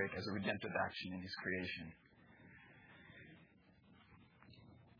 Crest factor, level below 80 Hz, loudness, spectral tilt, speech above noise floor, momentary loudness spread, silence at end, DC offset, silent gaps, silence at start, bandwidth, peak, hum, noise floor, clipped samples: 22 dB; -74 dBFS; -43 LUFS; -3.5 dB/octave; 24 dB; 24 LU; 0 s; under 0.1%; none; 0 s; 5.4 kHz; -24 dBFS; none; -68 dBFS; under 0.1%